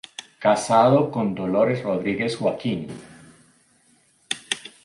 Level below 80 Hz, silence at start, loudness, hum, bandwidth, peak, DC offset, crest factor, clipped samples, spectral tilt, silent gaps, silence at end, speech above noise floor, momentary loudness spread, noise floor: -62 dBFS; 0.2 s; -22 LUFS; none; 11.5 kHz; -4 dBFS; under 0.1%; 20 dB; under 0.1%; -5.5 dB/octave; none; 0.15 s; 40 dB; 14 LU; -60 dBFS